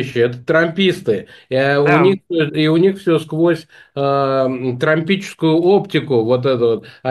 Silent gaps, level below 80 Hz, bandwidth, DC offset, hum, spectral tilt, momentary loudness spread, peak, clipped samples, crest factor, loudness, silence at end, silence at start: none; -58 dBFS; 12.5 kHz; under 0.1%; none; -7 dB/octave; 7 LU; 0 dBFS; under 0.1%; 14 dB; -16 LUFS; 0 s; 0 s